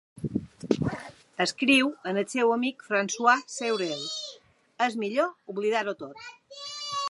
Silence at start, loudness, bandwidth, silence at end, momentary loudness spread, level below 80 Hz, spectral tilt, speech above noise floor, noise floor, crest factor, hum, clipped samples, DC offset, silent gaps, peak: 0.15 s; -27 LUFS; 11.5 kHz; 0 s; 17 LU; -60 dBFS; -4 dB/octave; 27 dB; -53 dBFS; 22 dB; none; under 0.1%; under 0.1%; none; -6 dBFS